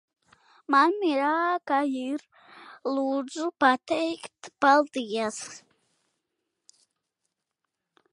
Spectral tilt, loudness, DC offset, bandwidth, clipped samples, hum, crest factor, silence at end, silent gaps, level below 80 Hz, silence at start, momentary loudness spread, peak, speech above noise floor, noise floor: -3 dB/octave; -26 LUFS; under 0.1%; 11.5 kHz; under 0.1%; none; 22 dB; 2.55 s; none; -78 dBFS; 0.7 s; 15 LU; -6 dBFS; 58 dB; -84 dBFS